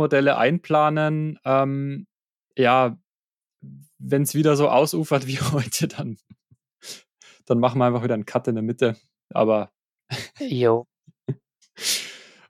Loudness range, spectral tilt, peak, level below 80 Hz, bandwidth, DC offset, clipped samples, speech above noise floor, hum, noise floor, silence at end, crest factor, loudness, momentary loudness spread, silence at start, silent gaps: 3 LU; -5.5 dB/octave; -4 dBFS; -66 dBFS; 16 kHz; under 0.1%; under 0.1%; over 69 dB; none; under -90 dBFS; 0.3 s; 18 dB; -22 LUFS; 18 LU; 0 s; 2.30-2.43 s, 3.09-3.20 s, 3.33-3.39 s, 9.24-9.28 s, 9.95-9.99 s